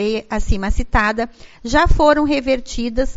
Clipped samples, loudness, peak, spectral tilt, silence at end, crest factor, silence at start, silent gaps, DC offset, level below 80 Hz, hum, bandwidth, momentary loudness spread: under 0.1%; -18 LUFS; 0 dBFS; -4.5 dB/octave; 0.05 s; 16 dB; 0 s; none; under 0.1%; -22 dBFS; none; 8 kHz; 10 LU